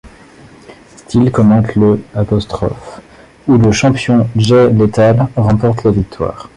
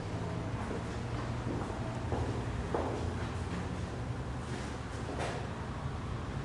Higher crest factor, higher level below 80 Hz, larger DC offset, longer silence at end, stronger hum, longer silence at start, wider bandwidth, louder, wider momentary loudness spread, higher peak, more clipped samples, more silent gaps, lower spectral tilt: second, 12 dB vs 18 dB; first, -34 dBFS vs -46 dBFS; neither; about the same, 0.1 s vs 0 s; neither; about the same, 0.05 s vs 0 s; about the same, 11 kHz vs 11.5 kHz; first, -12 LUFS vs -38 LUFS; first, 10 LU vs 4 LU; first, 0 dBFS vs -20 dBFS; neither; neither; about the same, -7 dB/octave vs -6.5 dB/octave